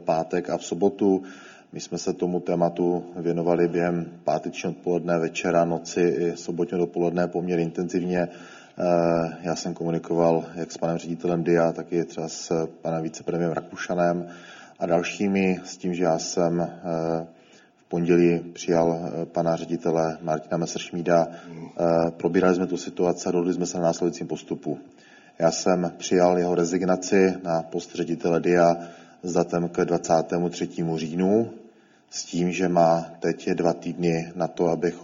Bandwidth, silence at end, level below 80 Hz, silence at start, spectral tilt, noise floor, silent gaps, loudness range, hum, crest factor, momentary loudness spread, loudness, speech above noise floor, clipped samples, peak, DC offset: 7.6 kHz; 0 s; -62 dBFS; 0 s; -6 dB/octave; -55 dBFS; none; 3 LU; none; 18 dB; 10 LU; -25 LUFS; 31 dB; under 0.1%; -6 dBFS; under 0.1%